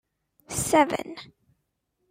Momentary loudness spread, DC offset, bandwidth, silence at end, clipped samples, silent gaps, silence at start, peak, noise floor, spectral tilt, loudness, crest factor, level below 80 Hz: 19 LU; under 0.1%; 16 kHz; 0.85 s; under 0.1%; none; 0.5 s; -6 dBFS; -77 dBFS; -3.5 dB/octave; -24 LUFS; 22 dB; -56 dBFS